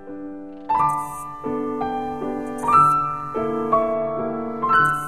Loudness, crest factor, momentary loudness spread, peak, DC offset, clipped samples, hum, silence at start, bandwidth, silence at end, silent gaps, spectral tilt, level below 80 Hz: -21 LUFS; 18 dB; 15 LU; -4 dBFS; 0.6%; under 0.1%; none; 0 s; 13.5 kHz; 0 s; none; -6 dB/octave; -52 dBFS